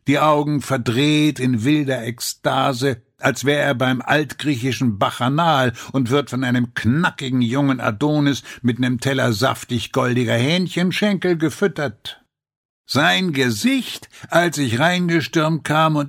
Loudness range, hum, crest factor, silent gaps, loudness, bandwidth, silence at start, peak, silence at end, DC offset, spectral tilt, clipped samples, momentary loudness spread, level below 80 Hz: 2 LU; none; 18 dB; 12.56-12.84 s; -19 LUFS; 16.5 kHz; 0.05 s; -2 dBFS; 0 s; under 0.1%; -5.5 dB/octave; under 0.1%; 6 LU; -58 dBFS